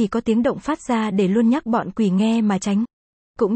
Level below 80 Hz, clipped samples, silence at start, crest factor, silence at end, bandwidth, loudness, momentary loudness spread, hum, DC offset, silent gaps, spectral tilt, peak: -54 dBFS; under 0.1%; 0 s; 12 dB; 0 s; 8.8 kHz; -20 LUFS; 6 LU; none; under 0.1%; 2.93-3.34 s; -6.5 dB/octave; -6 dBFS